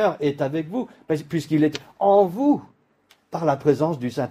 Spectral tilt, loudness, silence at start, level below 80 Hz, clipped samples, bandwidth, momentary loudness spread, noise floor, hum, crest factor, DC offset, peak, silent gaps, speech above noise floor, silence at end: -7.5 dB/octave; -22 LUFS; 0 s; -64 dBFS; under 0.1%; 15 kHz; 10 LU; -60 dBFS; none; 18 dB; under 0.1%; -4 dBFS; none; 39 dB; 0 s